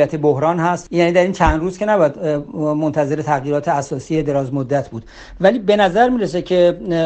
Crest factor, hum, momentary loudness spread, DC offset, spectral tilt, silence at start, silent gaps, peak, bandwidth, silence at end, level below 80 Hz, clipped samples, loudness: 16 dB; none; 7 LU; under 0.1%; -6.5 dB/octave; 0 s; none; 0 dBFS; 8.8 kHz; 0 s; -34 dBFS; under 0.1%; -17 LUFS